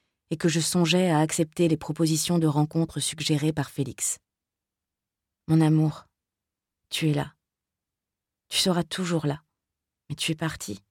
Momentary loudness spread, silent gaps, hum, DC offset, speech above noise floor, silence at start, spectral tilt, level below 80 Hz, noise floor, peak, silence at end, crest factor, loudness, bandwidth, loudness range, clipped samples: 12 LU; none; none; under 0.1%; 63 dB; 0.3 s; -5 dB/octave; -60 dBFS; -88 dBFS; -10 dBFS; 0.1 s; 18 dB; -25 LUFS; 17 kHz; 5 LU; under 0.1%